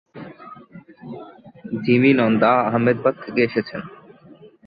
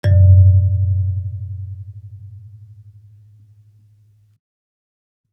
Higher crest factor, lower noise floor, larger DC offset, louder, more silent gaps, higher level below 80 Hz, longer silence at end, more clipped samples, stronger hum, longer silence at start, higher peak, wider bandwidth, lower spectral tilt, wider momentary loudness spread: about the same, 18 dB vs 16 dB; second, -47 dBFS vs -53 dBFS; neither; second, -18 LUFS vs -14 LUFS; neither; second, -62 dBFS vs -48 dBFS; second, 0.2 s vs 2.95 s; neither; neither; about the same, 0.15 s vs 0.05 s; about the same, -4 dBFS vs -2 dBFS; first, 5 kHz vs 3.4 kHz; about the same, -10.5 dB/octave vs -10 dB/octave; second, 25 LU vs 28 LU